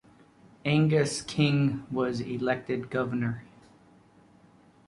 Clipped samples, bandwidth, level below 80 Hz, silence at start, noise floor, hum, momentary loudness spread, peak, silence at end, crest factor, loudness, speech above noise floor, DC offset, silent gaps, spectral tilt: under 0.1%; 11.5 kHz; -62 dBFS; 0.65 s; -58 dBFS; none; 8 LU; -10 dBFS; 1.45 s; 18 dB; -28 LUFS; 31 dB; under 0.1%; none; -6 dB/octave